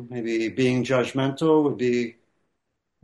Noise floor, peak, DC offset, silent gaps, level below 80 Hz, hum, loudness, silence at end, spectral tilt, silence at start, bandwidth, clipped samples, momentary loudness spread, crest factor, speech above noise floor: -78 dBFS; -10 dBFS; under 0.1%; none; -66 dBFS; none; -23 LUFS; 0.9 s; -6.5 dB/octave; 0 s; 11.5 kHz; under 0.1%; 7 LU; 14 dB; 56 dB